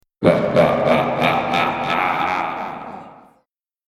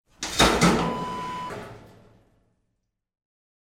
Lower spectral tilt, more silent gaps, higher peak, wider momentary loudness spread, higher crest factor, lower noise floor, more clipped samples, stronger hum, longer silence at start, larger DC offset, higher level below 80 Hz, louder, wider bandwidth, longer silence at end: first, -6.5 dB/octave vs -4 dB/octave; neither; first, 0 dBFS vs -6 dBFS; second, 14 LU vs 19 LU; about the same, 18 dB vs 22 dB; second, -66 dBFS vs -78 dBFS; neither; neither; about the same, 0.2 s vs 0.2 s; neither; second, -50 dBFS vs -42 dBFS; first, -18 LUFS vs -23 LUFS; second, 14 kHz vs 17.5 kHz; second, 0.75 s vs 1.8 s